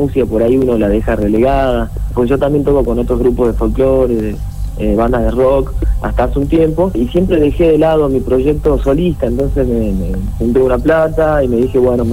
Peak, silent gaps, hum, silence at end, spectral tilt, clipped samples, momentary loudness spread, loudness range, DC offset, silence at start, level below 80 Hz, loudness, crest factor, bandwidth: -2 dBFS; none; none; 0 s; -8.5 dB/octave; under 0.1%; 6 LU; 2 LU; 2%; 0 s; -20 dBFS; -13 LUFS; 10 dB; 15.5 kHz